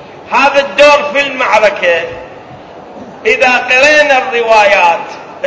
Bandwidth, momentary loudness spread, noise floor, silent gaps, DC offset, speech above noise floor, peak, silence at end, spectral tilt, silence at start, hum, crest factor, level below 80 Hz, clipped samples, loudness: 8 kHz; 11 LU; -31 dBFS; none; under 0.1%; 22 dB; 0 dBFS; 0 s; -2 dB/octave; 0 s; none; 10 dB; -46 dBFS; 2%; -8 LUFS